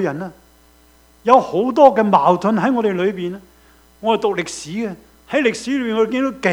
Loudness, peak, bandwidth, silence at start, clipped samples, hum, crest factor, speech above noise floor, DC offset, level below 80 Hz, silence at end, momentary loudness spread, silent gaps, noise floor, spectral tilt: -17 LUFS; 0 dBFS; 16.5 kHz; 0 s; under 0.1%; none; 18 dB; 34 dB; under 0.1%; -54 dBFS; 0 s; 15 LU; none; -51 dBFS; -5.5 dB/octave